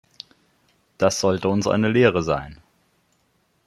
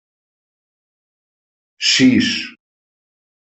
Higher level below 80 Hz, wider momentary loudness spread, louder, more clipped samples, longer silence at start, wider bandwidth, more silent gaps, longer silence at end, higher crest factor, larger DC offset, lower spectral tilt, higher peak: first, -52 dBFS vs -60 dBFS; first, 25 LU vs 13 LU; second, -20 LUFS vs -14 LUFS; neither; second, 1 s vs 1.8 s; first, 13 kHz vs 8.2 kHz; neither; first, 1.15 s vs 1 s; about the same, 20 dB vs 18 dB; neither; first, -5 dB/octave vs -3 dB/octave; about the same, -2 dBFS vs -2 dBFS